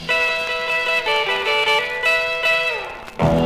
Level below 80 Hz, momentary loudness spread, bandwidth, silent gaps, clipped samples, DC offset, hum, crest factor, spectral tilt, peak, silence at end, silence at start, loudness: -42 dBFS; 5 LU; 15.5 kHz; none; under 0.1%; 0.2%; none; 14 dB; -4 dB/octave; -6 dBFS; 0 s; 0 s; -18 LUFS